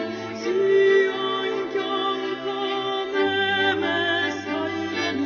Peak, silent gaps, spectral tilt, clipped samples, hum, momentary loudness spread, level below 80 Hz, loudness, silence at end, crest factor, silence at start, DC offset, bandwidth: -8 dBFS; none; -1.5 dB/octave; under 0.1%; none; 8 LU; -68 dBFS; -23 LUFS; 0 s; 14 dB; 0 s; under 0.1%; 7 kHz